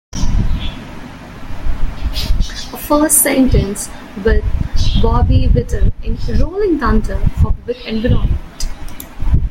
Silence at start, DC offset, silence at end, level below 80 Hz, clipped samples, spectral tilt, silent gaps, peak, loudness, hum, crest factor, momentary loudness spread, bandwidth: 0.15 s; under 0.1%; 0 s; -18 dBFS; under 0.1%; -5 dB/octave; none; 0 dBFS; -16 LUFS; none; 14 dB; 15 LU; 16.5 kHz